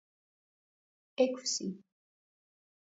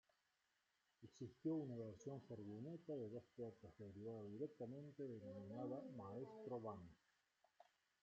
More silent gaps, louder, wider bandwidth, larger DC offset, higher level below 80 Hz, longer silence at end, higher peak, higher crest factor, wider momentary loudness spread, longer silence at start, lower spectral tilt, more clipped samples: neither; first, -33 LUFS vs -54 LUFS; about the same, 7.6 kHz vs 8 kHz; neither; about the same, -88 dBFS vs -88 dBFS; first, 1.1 s vs 0.4 s; first, -16 dBFS vs -36 dBFS; first, 24 dB vs 18 dB; first, 18 LU vs 10 LU; first, 1.2 s vs 1 s; second, -4 dB/octave vs -9 dB/octave; neither